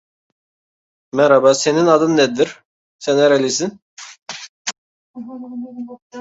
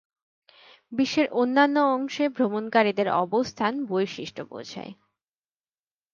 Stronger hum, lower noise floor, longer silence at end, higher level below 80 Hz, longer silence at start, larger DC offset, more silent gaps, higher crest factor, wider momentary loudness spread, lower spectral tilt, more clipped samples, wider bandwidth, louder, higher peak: neither; about the same, under -90 dBFS vs under -90 dBFS; second, 0 s vs 1.2 s; first, -64 dBFS vs -70 dBFS; first, 1.15 s vs 0.9 s; neither; first, 2.65-2.99 s, 3.82-3.97 s, 4.22-4.26 s, 4.49-4.65 s, 4.78-5.14 s, 6.02-6.10 s vs none; about the same, 18 dB vs 20 dB; first, 21 LU vs 16 LU; about the same, -4 dB/octave vs -5 dB/octave; neither; about the same, 8 kHz vs 7.4 kHz; first, -16 LUFS vs -24 LUFS; first, 0 dBFS vs -6 dBFS